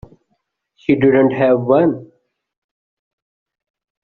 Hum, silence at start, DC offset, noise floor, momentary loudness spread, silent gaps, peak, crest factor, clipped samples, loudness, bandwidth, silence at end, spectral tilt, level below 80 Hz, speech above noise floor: none; 0.9 s; under 0.1%; -69 dBFS; 10 LU; none; -2 dBFS; 16 dB; under 0.1%; -14 LUFS; 4.3 kHz; 2 s; -7 dB/octave; -54 dBFS; 56 dB